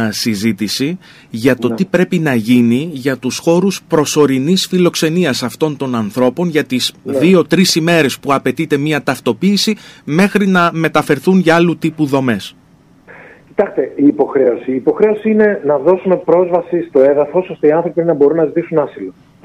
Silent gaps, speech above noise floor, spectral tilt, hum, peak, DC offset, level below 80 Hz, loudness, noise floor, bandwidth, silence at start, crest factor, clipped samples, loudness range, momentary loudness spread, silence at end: none; 33 dB; -5.5 dB/octave; none; 0 dBFS; under 0.1%; -54 dBFS; -13 LUFS; -46 dBFS; 15.5 kHz; 0 s; 14 dB; under 0.1%; 2 LU; 7 LU; 0.35 s